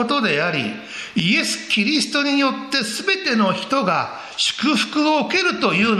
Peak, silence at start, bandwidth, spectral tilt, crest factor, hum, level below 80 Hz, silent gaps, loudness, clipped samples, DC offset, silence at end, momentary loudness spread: -2 dBFS; 0 s; 14 kHz; -3.5 dB/octave; 18 dB; none; -62 dBFS; none; -19 LUFS; under 0.1%; under 0.1%; 0 s; 5 LU